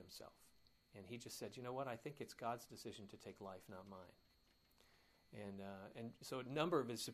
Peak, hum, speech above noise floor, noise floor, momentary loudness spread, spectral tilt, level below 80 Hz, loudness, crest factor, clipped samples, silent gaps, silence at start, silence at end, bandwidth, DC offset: -26 dBFS; none; 27 dB; -76 dBFS; 19 LU; -4.5 dB/octave; -80 dBFS; -49 LUFS; 24 dB; under 0.1%; none; 0 s; 0 s; 15.5 kHz; under 0.1%